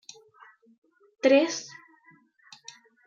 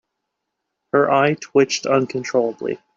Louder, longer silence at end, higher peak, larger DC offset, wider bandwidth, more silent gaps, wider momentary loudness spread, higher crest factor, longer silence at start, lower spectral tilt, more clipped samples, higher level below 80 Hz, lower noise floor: second, -24 LUFS vs -19 LUFS; first, 1.4 s vs 0.2 s; second, -8 dBFS vs -4 dBFS; neither; about the same, 7.6 kHz vs 7.6 kHz; neither; first, 26 LU vs 5 LU; about the same, 22 dB vs 18 dB; first, 1.25 s vs 0.95 s; second, -2.5 dB/octave vs -4.5 dB/octave; neither; second, -82 dBFS vs -66 dBFS; second, -60 dBFS vs -78 dBFS